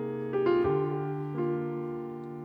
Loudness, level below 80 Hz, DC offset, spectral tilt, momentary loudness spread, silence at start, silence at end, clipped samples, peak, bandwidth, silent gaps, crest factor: -31 LUFS; -62 dBFS; under 0.1%; -10 dB/octave; 10 LU; 0 s; 0 s; under 0.1%; -16 dBFS; 5 kHz; none; 14 dB